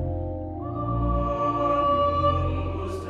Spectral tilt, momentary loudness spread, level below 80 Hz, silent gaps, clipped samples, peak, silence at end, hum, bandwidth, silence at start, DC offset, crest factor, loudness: -8.5 dB/octave; 10 LU; -34 dBFS; none; under 0.1%; -10 dBFS; 0 s; none; 9.6 kHz; 0 s; under 0.1%; 14 dB; -25 LUFS